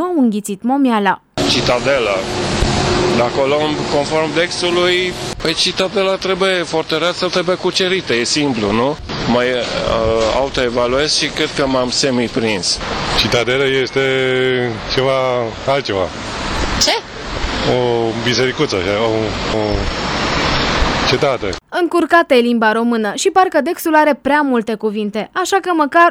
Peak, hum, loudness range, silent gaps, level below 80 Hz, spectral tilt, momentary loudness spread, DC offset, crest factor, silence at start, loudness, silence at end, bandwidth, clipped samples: 0 dBFS; none; 3 LU; none; -32 dBFS; -4 dB/octave; 6 LU; under 0.1%; 16 dB; 0 s; -15 LUFS; 0 s; 17.5 kHz; under 0.1%